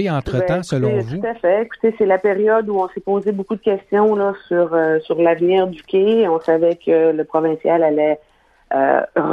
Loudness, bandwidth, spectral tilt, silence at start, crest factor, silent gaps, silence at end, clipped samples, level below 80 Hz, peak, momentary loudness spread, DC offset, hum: -17 LUFS; 10 kHz; -7.5 dB/octave; 0 s; 16 dB; none; 0 s; under 0.1%; -48 dBFS; 0 dBFS; 5 LU; under 0.1%; none